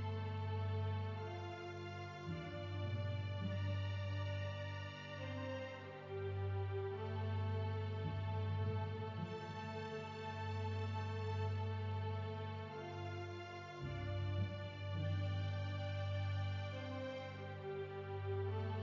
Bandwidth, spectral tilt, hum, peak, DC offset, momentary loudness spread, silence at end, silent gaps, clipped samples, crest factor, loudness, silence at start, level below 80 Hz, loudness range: 7.4 kHz; -7.5 dB/octave; none; -30 dBFS; under 0.1%; 6 LU; 0 s; none; under 0.1%; 12 dB; -44 LUFS; 0 s; -56 dBFS; 2 LU